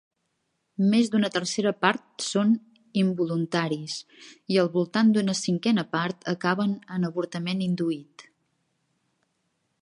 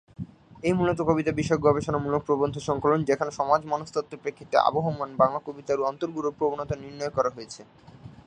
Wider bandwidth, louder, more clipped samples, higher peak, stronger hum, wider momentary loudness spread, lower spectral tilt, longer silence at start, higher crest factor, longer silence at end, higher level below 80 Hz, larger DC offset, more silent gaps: about the same, 11 kHz vs 10 kHz; about the same, -26 LUFS vs -26 LUFS; neither; about the same, -4 dBFS vs -4 dBFS; neither; second, 8 LU vs 12 LU; about the same, -5.5 dB/octave vs -6.5 dB/octave; first, 0.8 s vs 0.2 s; about the same, 22 dB vs 22 dB; first, 1.6 s vs 0.15 s; second, -74 dBFS vs -54 dBFS; neither; neither